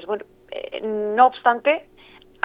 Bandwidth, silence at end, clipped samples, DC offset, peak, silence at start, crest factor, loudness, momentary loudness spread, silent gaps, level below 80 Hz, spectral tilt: 4.9 kHz; 0.6 s; under 0.1%; under 0.1%; 0 dBFS; 0 s; 22 dB; -20 LUFS; 17 LU; none; -62 dBFS; -6.5 dB/octave